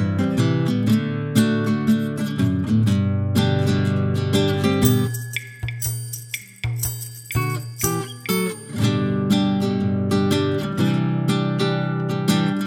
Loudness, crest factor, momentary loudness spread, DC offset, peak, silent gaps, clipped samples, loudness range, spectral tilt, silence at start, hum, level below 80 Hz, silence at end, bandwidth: -21 LUFS; 18 dB; 8 LU; under 0.1%; -2 dBFS; none; under 0.1%; 5 LU; -6 dB/octave; 0 s; none; -48 dBFS; 0 s; over 20 kHz